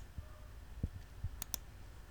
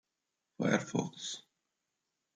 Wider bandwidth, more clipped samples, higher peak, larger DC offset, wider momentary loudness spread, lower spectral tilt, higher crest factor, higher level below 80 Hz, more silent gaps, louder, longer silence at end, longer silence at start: first, over 20 kHz vs 9.6 kHz; neither; about the same, -16 dBFS vs -16 dBFS; neither; first, 13 LU vs 10 LU; about the same, -4 dB/octave vs -4.5 dB/octave; first, 30 dB vs 24 dB; first, -50 dBFS vs -78 dBFS; neither; second, -47 LUFS vs -35 LUFS; second, 0 s vs 0.95 s; second, 0 s vs 0.6 s